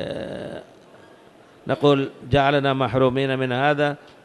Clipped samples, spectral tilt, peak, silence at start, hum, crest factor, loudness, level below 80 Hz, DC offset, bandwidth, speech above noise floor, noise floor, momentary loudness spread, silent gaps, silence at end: under 0.1%; -7 dB/octave; -6 dBFS; 0 s; none; 16 dB; -21 LUFS; -50 dBFS; under 0.1%; 11.5 kHz; 29 dB; -50 dBFS; 15 LU; none; 0.3 s